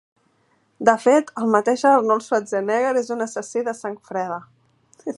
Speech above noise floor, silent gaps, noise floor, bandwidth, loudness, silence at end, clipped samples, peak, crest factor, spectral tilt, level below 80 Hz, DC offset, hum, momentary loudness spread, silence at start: 44 dB; none; -64 dBFS; 11.5 kHz; -20 LUFS; 0.05 s; under 0.1%; 0 dBFS; 20 dB; -4.5 dB/octave; -74 dBFS; under 0.1%; none; 12 LU; 0.8 s